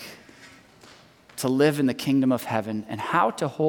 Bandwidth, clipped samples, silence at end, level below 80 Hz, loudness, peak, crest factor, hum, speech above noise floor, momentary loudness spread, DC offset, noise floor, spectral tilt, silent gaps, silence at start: 18 kHz; under 0.1%; 0 s; -68 dBFS; -24 LUFS; -8 dBFS; 18 dB; none; 29 dB; 10 LU; under 0.1%; -52 dBFS; -6 dB/octave; none; 0 s